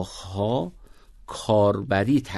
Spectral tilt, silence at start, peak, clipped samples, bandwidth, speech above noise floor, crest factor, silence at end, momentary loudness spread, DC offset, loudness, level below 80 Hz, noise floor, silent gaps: -6.5 dB/octave; 0 s; -8 dBFS; under 0.1%; 12.5 kHz; 23 dB; 16 dB; 0 s; 14 LU; under 0.1%; -24 LUFS; -50 dBFS; -46 dBFS; none